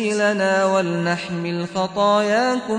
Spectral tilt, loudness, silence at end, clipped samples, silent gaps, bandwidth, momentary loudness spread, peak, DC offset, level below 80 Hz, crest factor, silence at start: -5 dB/octave; -20 LUFS; 0 s; under 0.1%; none; 10.5 kHz; 7 LU; -6 dBFS; under 0.1%; -62 dBFS; 12 dB; 0 s